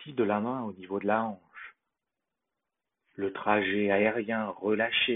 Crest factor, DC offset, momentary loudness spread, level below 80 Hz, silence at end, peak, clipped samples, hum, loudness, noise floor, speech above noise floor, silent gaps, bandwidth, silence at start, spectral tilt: 20 dB; under 0.1%; 15 LU; -72 dBFS; 0 s; -10 dBFS; under 0.1%; none; -29 LUFS; -88 dBFS; 59 dB; none; 4 kHz; 0 s; -2.5 dB/octave